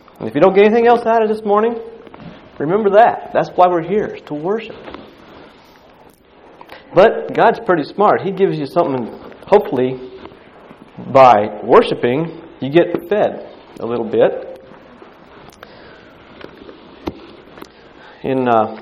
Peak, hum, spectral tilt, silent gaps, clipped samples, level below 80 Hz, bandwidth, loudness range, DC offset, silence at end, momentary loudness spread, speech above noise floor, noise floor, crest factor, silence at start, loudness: 0 dBFS; none; -7.5 dB/octave; none; 0.1%; -52 dBFS; 9.6 kHz; 10 LU; under 0.1%; 0 s; 22 LU; 32 dB; -46 dBFS; 16 dB; 0.2 s; -14 LUFS